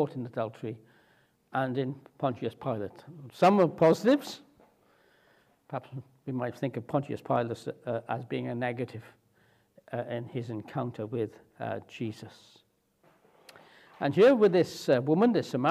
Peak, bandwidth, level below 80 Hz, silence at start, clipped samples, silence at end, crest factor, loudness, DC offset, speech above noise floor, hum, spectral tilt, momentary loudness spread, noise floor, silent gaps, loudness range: -10 dBFS; 15 kHz; -76 dBFS; 0 s; under 0.1%; 0 s; 20 dB; -29 LUFS; under 0.1%; 38 dB; none; -7 dB/octave; 18 LU; -67 dBFS; none; 10 LU